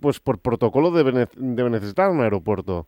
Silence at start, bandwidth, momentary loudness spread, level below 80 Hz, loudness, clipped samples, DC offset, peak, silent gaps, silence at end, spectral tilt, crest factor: 0 s; 16.5 kHz; 6 LU; -50 dBFS; -21 LUFS; under 0.1%; under 0.1%; -6 dBFS; none; 0.05 s; -8 dB/octave; 16 dB